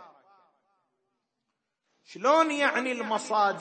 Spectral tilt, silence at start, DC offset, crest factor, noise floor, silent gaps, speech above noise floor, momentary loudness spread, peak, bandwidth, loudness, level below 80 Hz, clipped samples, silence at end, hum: -3 dB/octave; 0 s; under 0.1%; 20 dB; -82 dBFS; none; 57 dB; 7 LU; -10 dBFS; 8.8 kHz; -26 LUFS; under -90 dBFS; under 0.1%; 0 s; none